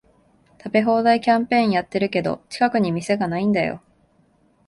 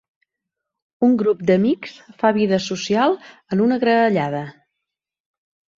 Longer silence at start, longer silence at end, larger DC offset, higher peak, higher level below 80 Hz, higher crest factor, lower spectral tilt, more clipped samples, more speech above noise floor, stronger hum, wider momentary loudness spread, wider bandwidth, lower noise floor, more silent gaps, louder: second, 0.65 s vs 1 s; second, 0.9 s vs 1.25 s; neither; about the same, -4 dBFS vs -2 dBFS; about the same, -58 dBFS vs -62 dBFS; about the same, 18 dB vs 18 dB; about the same, -6.5 dB/octave vs -6 dB/octave; neither; second, 40 dB vs 65 dB; neither; about the same, 8 LU vs 10 LU; first, 11.5 kHz vs 7.6 kHz; second, -60 dBFS vs -83 dBFS; neither; about the same, -20 LUFS vs -19 LUFS